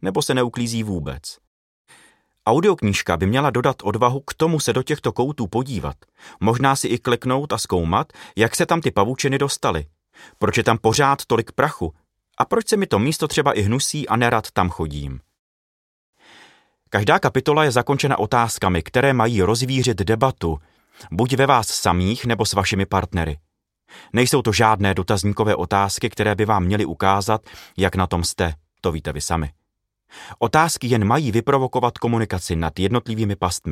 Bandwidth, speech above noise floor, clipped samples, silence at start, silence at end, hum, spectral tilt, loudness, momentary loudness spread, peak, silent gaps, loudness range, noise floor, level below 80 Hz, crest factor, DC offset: 16 kHz; 56 dB; under 0.1%; 0 s; 0 s; none; -5 dB/octave; -20 LUFS; 9 LU; 0 dBFS; 1.47-1.85 s, 15.39-16.13 s; 3 LU; -76 dBFS; -42 dBFS; 20 dB; under 0.1%